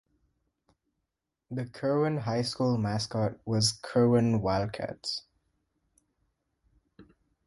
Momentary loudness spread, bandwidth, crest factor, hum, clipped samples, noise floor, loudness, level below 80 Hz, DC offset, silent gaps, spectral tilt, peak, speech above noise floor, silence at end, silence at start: 11 LU; 11.5 kHz; 18 dB; none; under 0.1%; -85 dBFS; -29 LUFS; -58 dBFS; under 0.1%; none; -5.5 dB/octave; -12 dBFS; 57 dB; 0.45 s; 1.5 s